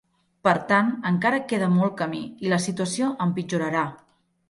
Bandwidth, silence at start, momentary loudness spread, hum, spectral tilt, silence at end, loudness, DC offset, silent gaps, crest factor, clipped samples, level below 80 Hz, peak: 11.5 kHz; 0.45 s; 7 LU; none; -5.5 dB/octave; 0.55 s; -24 LUFS; under 0.1%; none; 18 dB; under 0.1%; -66 dBFS; -6 dBFS